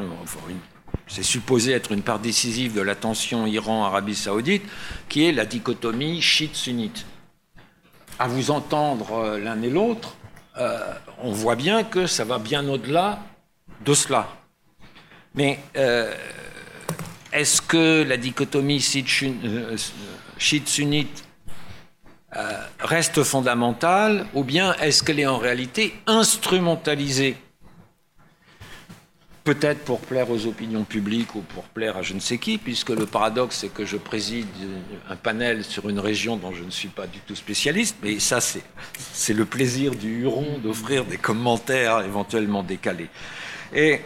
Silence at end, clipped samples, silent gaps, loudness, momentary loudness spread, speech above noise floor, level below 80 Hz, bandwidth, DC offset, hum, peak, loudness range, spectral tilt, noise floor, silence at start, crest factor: 0 s; under 0.1%; none; -23 LUFS; 15 LU; 33 dB; -54 dBFS; 16.5 kHz; under 0.1%; none; -6 dBFS; 6 LU; -3.5 dB/octave; -56 dBFS; 0 s; 18 dB